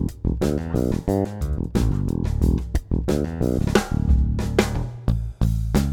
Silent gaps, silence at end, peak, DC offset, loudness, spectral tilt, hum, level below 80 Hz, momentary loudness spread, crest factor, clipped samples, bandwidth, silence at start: none; 0 s; -2 dBFS; under 0.1%; -23 LUFS; -7 dB/octave; none; -26 dBFS; 5 LU; 18 dB; under 0.1%; 17 kHz; 0 s